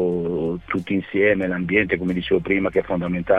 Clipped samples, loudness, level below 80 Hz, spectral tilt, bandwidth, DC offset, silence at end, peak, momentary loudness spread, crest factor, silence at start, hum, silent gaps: under 0.1%; -21 LUFS; -46 dBFS; -8.5 dB/octave; 5.8 kHz; 0.1%; 0 s; -6 dBFS; 5 LU; 16 dB; 0 s; none; none